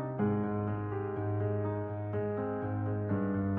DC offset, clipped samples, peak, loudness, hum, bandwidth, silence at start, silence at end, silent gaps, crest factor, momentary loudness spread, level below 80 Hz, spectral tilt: under 0.1%; under 0.1%; -20 dBFS; -34 LUFS; none; 3.2 kHz; 0 s; 0 s; none; 12 dB; 4 LU; -62 dBFS; -10 dB/octave